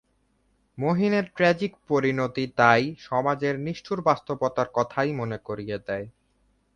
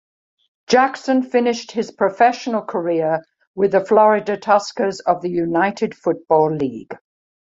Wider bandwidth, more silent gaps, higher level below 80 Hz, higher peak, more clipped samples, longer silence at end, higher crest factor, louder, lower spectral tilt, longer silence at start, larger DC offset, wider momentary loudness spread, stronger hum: first, 9.8 kHz vs 7.8 kHz; second, none vs 3.47-3.54 s; about the same, -60 dBFS vs -64 dBFS; about the same, -4 dBFS vs -2 dBFS; neither; about the same, 0.65 s vs 0.65 s; first, 22 dB vs 16 dB; second, -25 LUFS vs -18 LUFS; about the same, -6.5 dB/octave vs -5.5 dB/octave; about the same, 0.75 s vs 0.7 s; neither; about the same, 11 LU vs 10 LU; neither